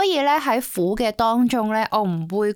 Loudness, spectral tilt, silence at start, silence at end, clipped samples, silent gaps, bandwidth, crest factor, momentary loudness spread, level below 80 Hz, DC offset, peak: -20 LUFS; -5 dB/octave; 0 s; 0 s; under 0.1%; none; 19 kHz; 12 dB; 4 LU; -48 dBFS; under 0.1%; -8 dBFS